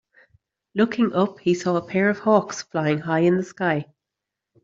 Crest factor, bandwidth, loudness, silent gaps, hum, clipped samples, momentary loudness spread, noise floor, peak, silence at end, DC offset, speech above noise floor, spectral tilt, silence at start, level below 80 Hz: 18 dB; 7.8 kHz; -22 LUFS; none; none; under 0.1%; 5 LU; -85 dBFS; -4 dBFS; 0.8 s; under 0.1%; 64 dB; -6.5 dB/octave; 0.75 s; -66 dBFS